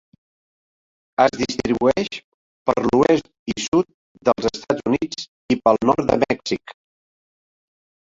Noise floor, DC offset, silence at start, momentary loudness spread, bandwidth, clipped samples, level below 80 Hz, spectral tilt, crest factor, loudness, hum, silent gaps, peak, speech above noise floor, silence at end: under -90 dBFS; under 0.1%; 1.2 s; 12 LU; 7.8 kHz; under 0.1%; -50 dBFS; -5 dB/octave; 20 dB; -20 LUFS; none; 2.24-2.65 s, 3.39-3.46 s, 3.68-3.72 s, 3.94-4.15 s, 5.28-5.49 s; -2 dBFS; over 71 dB; 1.5 s